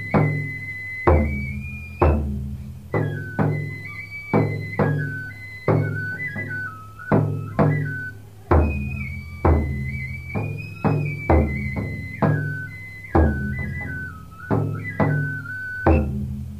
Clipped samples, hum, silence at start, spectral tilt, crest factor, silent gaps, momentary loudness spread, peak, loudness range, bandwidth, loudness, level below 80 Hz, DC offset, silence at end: under 0.1%; none; 0 s; -9 dB/octave; 20 dB; none; 12 LU; -4 dBFS; 2 LU; 8 kHz; -24 LUFS; -30 dBFS; 0.3%; 0 s